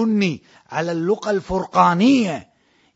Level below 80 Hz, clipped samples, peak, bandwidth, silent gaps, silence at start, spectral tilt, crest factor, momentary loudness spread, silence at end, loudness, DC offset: -50 dBFS; under 0.1%; 0 dBFS; 8 kHz; none; 0 s; -6 dB/octave; 18 dB; 13 LU; 0.55 s; -19 LUFS; under 0.1%